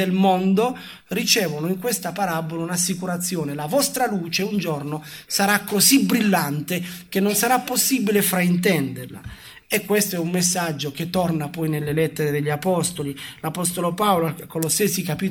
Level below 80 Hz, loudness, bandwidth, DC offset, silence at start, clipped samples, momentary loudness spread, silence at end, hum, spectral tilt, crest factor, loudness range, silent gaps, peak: -56 dBFS; -21 LUFS; 18.5 kHz; under 0.1%; 0 s; under 0.1%; 9 LU; 0 s; none; -4 dB/octave; 18 dB; 4 LU; none; -4 dBFS